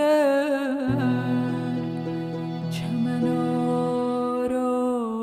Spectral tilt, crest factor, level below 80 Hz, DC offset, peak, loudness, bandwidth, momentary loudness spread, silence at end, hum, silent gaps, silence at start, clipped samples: -7.5 dB/octave; 12 dB; -58 dBFS; under 0.1%; -12 dBFS; -25 LUFS; 14 kHz; 7 LU; 0 s; none; none; 0 s; under 0.1%